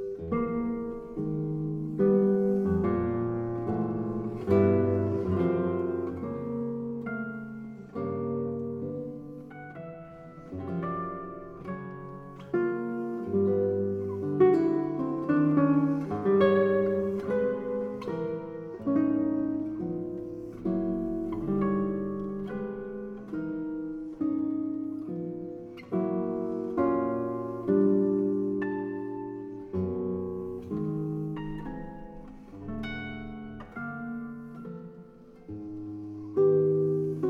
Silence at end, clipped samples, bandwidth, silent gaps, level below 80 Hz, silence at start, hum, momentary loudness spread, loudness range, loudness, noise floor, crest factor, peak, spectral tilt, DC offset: 0 s; under 0.1%; 5.4 kHz; none; -56 dBFS; 0 s; none; 17 LU; 11 LU; -30 LUFS; -50 dBFS; 20 dB; -10 dBFS; -10 dB/octave; under 0.1%